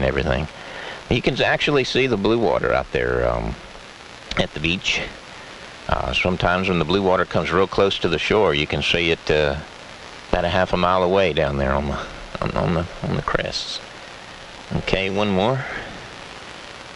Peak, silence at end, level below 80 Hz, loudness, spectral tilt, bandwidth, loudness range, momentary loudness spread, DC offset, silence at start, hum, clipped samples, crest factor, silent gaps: -2 dBFS; 0 s; -36 dBFS; -21 LUFS; -5.5 dB/octave; 10.5 kHz; 5 LU; 18 LU; under 0.1%; 0 s; none; under 0.1%; 20 dB; none